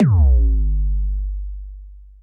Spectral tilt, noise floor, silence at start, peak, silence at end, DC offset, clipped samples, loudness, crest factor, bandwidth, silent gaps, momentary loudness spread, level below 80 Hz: -12 dB/octave; -38 dBFS; 0 s; -6 dBFS; 0.2 s; under 0.1%; under 0.1%; -19 LUFS; 10 dB; 2.2 kHz; none; 20 LU; -18 dBFS